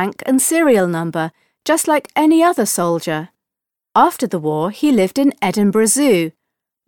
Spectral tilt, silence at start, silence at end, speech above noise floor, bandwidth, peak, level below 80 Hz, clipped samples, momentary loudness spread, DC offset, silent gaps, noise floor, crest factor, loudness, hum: -4.5 dB/octave; 0 s; 0.6 s; 69 dB; 19 kHz; -2 dBFS; -60 dBFS; under 0.1%; 10 LU; under 0.1%; none; -85 dBFS; 14 dB; -16 LUFS; none